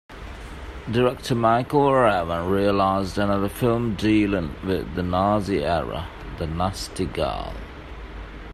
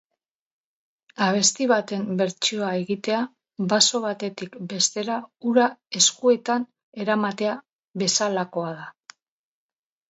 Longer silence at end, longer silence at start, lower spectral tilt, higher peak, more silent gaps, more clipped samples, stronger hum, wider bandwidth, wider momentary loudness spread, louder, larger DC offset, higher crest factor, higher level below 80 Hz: second, 0 s vs 1.2 s; second, 0.1 s vs 1.2 s; first, -6.5 dB/octave vs -2.5 dB/octave; about the same, -6 dBFS vs -4 dBFS; second, none vs 6.83-6.92 s, 7.72-7.94 s; neither; neither; first, 15 kHz vs 8.2 kHz; first, 18 LU vs 14 LU; about the same, -23 LUFS vs -23 LUFS; neither; about the same, 18 dB vs 20 dB; first, -40 dBFS vs -74 dBFS